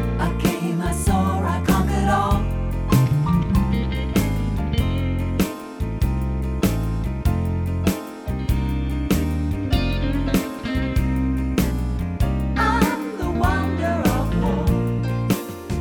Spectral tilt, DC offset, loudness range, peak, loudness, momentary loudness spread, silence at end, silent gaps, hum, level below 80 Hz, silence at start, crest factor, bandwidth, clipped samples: -6.5 dB/octave; under 0.1%; 3 LU; -4 dBFS; -22 LUFS; 6 LU; 0 s; none; none; -26 dBFS; 0 s; 16 dB; 20 kHz; under 0.1%